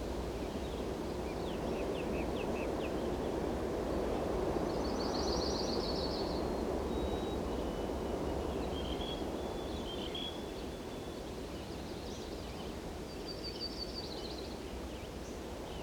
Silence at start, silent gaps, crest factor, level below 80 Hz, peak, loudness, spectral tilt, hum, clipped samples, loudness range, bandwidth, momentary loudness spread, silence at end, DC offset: 0 s; none; 18 dB; -46 dBFS; -20 dBFS; -38 LUFS; -5.5 dB/octave; none; under 0.1%; 7 LU; over 20 kHz; 8 LU; 0 s; under 0.1%